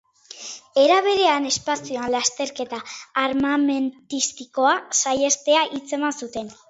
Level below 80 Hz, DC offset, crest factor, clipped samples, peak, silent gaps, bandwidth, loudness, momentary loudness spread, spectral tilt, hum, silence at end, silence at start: -62 dBFS; under 0.1%; 18 dB; under 0.1%; -4 dBFS; none; 8.2 kHz; -21 LUFS; 13 LU; -1.5 dB/octave; none; 0.15 s; 0.35 s